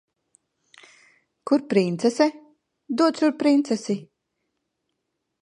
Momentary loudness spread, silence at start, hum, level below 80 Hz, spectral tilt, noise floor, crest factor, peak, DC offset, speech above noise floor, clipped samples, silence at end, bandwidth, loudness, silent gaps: 10 LU; 1.45 s; none; -78 dBFS; -5.5 dB/octave; -79 dBFS; 20 dB; -6 dBFS; under 0.1%; 58 dB; under 0.1%; 1.4 s; 11 kHz; -22 LUFS; none